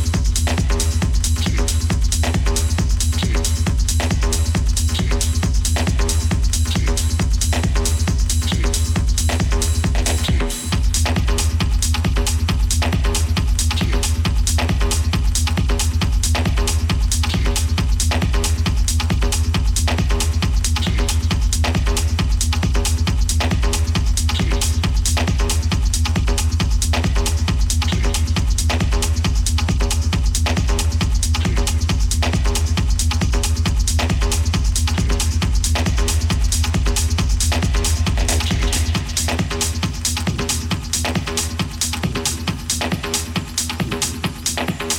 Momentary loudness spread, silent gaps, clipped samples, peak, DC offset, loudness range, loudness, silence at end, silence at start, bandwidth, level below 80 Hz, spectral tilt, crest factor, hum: 2 LU; none; under 0.1%; -4 dBFS; under 0.1%; 1 LU; -19 LUFS; 0 s; 0 s; 17.5 kHz; -20 dBFS; -4 dB/octave; 14 dB; none